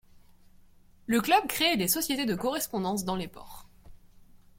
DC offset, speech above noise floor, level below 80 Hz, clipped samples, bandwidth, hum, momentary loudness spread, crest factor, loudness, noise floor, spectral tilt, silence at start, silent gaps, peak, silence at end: under 0.1%; 28 dB; -56 dBFS; under 0.1%; 16.5 kHz; none; 18 LU; 20 dB; -27 LUFS; -56 dBFS; -3 dB/octave; 0.15 s; none; -10 dBFS; 0.5 s